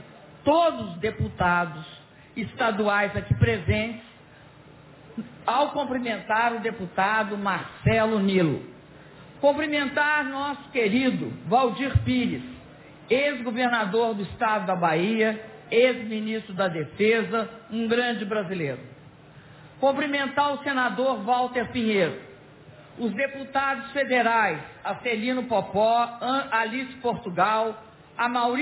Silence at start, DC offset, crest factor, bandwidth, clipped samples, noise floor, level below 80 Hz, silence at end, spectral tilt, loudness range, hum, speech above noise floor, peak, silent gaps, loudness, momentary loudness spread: 0 s; under 0.1%; 18 dB; 4 kHz; under 0.1%; -50 dBFS; -48 dBFS; 0 s; -9.5 dB/octave; 3 LU; none; 25 dB; -8 dBFS; none; -25 LUFS; 10 LU